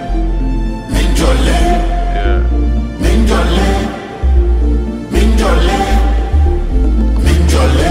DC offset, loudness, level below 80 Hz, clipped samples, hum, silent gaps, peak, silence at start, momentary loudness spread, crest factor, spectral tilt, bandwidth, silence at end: under 0.1%; -13 LUFS; -12 dBFS; under 0.1%; none; none; 0 dBFS; 0 s; 6 LU; 10 dB; -6 dB/octave; 13 kHz; 0 s